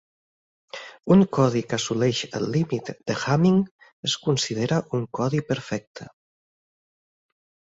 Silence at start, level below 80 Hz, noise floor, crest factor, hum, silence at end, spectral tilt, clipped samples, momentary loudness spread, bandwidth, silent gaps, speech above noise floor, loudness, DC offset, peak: 0.75 s; -60 dBFS; under -90 dBFS; 18 dB; none; 1.7 s; -5.5 dB/octave; under 0.1%; 16 LU; 8 kHz; 3.71-3.79 s, 3.93-4.03 s, 5.87-5.94 s; over 67 dB; -24 LUFS; under 0.1%; -6 dBFS